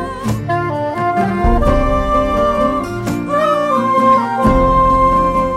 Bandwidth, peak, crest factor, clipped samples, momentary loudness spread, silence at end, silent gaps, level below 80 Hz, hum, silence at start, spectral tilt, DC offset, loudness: 15 kHz; -2 dBFS; 12 dB; under 0.1%; 7 LU; 0 s; none; -22 dBFS; none; 0 s; -7 dB/octave; under 0.1%; -14 LUFS